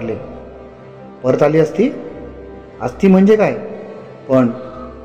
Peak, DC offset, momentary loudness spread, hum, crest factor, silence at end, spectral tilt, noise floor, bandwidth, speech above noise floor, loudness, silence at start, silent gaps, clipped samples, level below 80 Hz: -2 dBFS; 0.3%; 24 LU; none; 14 dB; 0 s; -8.5 dB/octave; -36 dBFS; 8.2 kHz; 23 dB; -15 LUFS; 0 s; none; under 0.1%; -44 dBFS